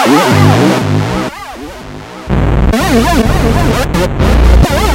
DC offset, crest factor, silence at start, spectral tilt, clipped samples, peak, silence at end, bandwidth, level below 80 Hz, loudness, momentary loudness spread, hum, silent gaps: under 0.1%; 10 dB; 0 s; -6 dB/octave; 0.7%; 0 dBFS; 0 s; 16.5 kHz; -14 dBFS; -10 LUFS; 18 LU; none; none